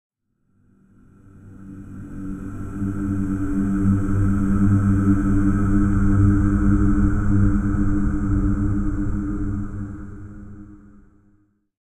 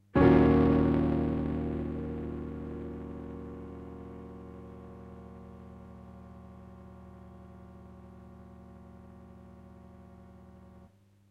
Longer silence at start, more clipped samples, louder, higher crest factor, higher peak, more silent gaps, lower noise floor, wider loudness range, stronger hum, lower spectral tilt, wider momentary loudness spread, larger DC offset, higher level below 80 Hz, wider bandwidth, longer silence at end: first, 1.35 s vs 0.15 s; neither; first, -21 LUFS vs -29 LUFS; second, 16 dB vs 22 dB; first, -4 dBFS vs -10 dBFS; neither; first, -66 dBFS vs -59 dBFS; second, 10 LU vs 22 LU; neither; about the same, -10 dB/octave vs -10 dB/octave; second, 19 LU vs 28 LU; neither; first, -26 dBFS vs -44 dBFS; first, 8.8 kHz vs 5.4 kHz; first, 1.1 s vs 0.85 s